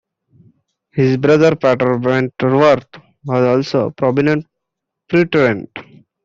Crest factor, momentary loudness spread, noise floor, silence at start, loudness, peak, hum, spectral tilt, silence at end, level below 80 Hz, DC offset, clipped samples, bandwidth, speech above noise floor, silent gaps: 14 dB; 11 LU; -79 dBFS; 0.95 s; -15 LUFS; -2 dBFS; none; -7.5 dB/octave; 0.4 s; -54 dBFS; under 0.1%; under 0.1%; 7.6 kHz; 65 dB; none